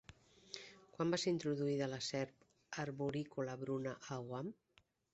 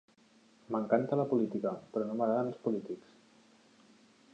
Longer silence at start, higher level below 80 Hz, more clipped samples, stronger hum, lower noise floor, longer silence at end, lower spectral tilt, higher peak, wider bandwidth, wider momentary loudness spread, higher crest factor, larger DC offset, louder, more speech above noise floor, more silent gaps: second, 0.1 s vs 0.7 s; first, -76 dBFS vs -82 dBFS; neither; neither; about the same, -64 dBFS vs -65 dBFS; second, 0.6 s vs 1.35 s; second, -5 dB/octave vs -9 dB/octave; second, -26 dBFS vs -14 dBFS; about the same, 8.2 kHz vs 8.6 kHz; first, 14 LU vs 8 LU; about the same, 18 dB vs 22 dB; neither; second, -42 LUFS vs -33 LUFS; second, 23 dB vs 32 dB; neither